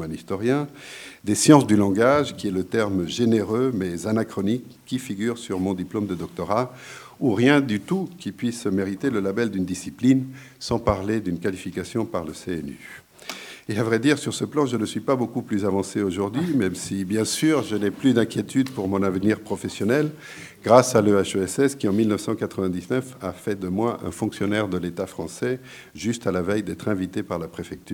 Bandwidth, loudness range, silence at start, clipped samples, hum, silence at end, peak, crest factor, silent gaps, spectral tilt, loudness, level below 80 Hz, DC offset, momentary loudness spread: 19 kHz; 6 LU; 0 s; under 0.1%; none; 0 s; 0 dBFS; 24 dB; none; -5.5 dB/octave; -23 LUFS; -54 dBFS; under 0.1%; 13 LU